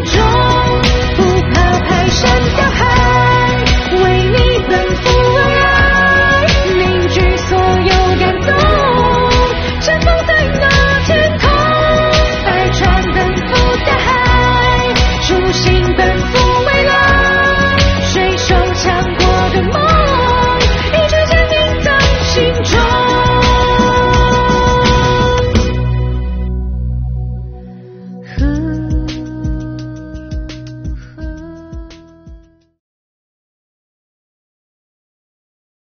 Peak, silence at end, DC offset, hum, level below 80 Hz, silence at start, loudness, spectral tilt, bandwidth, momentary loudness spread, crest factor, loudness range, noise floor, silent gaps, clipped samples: 0 dBFS; 3.55 s; under 0.1%; none; -18 dBFS; 0 s; -11 LUFS; -5 dB/octave; 6.8 kHz; 12 LU; 12 dB; 11 LU; -39 dBFS; none; under 0.1%